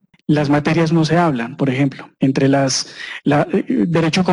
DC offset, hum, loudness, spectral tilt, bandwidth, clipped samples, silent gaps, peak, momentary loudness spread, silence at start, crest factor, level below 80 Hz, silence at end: under 0.1%; none; -17 LUFS; -5.5 dB/octave; 11.5 kHz; under 0.1%; none; -4 dBFS; 6 LU; 0.3 s; 12 dB; -50 dBFS; 0 s